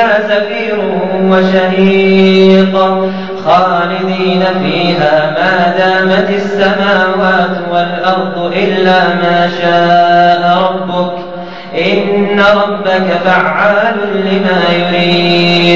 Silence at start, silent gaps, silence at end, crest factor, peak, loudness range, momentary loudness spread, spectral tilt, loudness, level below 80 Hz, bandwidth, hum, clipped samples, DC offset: 0 s; none; 0 s; 10 dB; 0 dBFS; 2 LU; 6 LU; -6.5 dB/octave; -10 LUFS; -48 dBFS; 7.4 kHz; none; under 0.1%; 2%